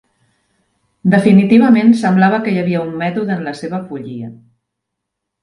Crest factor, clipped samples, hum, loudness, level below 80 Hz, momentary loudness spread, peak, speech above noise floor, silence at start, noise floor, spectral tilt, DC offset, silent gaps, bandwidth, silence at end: 14 dB; under 0.1%; none; -13 LUFS; -58 dBFS; 17 LU; 0 dBFS; 65 dB; 1.05 s; -77 dBFS; -8 dB/octave; under 0.1%; none; 11 kHz; 1.1 s